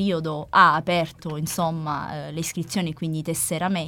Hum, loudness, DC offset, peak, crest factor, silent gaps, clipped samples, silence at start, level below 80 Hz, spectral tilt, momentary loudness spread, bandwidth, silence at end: none; -23 LUFS; under 0.1%; -2 dBFS; 20 dB; none; under 0.1%; 0 s; -54 dBFS; -4.5 dB/octave; 13 LU; 18 kHz; 0 s